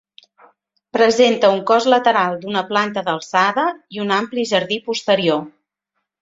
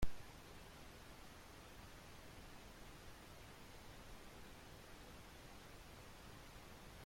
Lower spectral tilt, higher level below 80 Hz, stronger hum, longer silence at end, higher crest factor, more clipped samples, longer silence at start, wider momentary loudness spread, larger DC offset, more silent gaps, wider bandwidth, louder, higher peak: about the same, -4 dB/octave vs -4 dB/octave; about the same, -64 dBFS vs -60 dBFS; neither; first, 0.7 s vs 0 s; second, 18 dB vs 24 dB; neither; first, 0.95 s vs 0 s; first, 9 LU vs 0 LU; neither; neither; second, 7.8 kHz vs 16.5 kHz; first, -17 LUFS vs -58 LUFS; first, 0 dBFS vs -26 dBFS